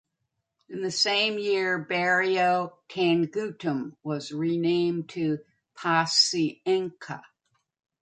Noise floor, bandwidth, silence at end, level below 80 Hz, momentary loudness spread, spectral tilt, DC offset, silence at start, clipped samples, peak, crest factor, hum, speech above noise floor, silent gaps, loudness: -81 dBFS; 9.4 kHz; 0.8 s; -74 dBFS; 12 LU; -4 dB/octave; under 0.1%; 0.7 s; under 0.1%; -8 dBFS; 20 dB; none; 54 dB; none; -26 LUFS